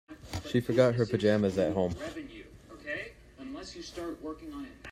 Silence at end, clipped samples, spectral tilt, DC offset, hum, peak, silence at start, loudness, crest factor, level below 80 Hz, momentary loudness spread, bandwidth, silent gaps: 0 s; under 0.1%; -6.5 dB/octave; under 0.1%; none; -12 dBFS; 0.1 s; -31 LUFS; 20 dB; -56 dBFS; 19 LU; 15.5 kHz; none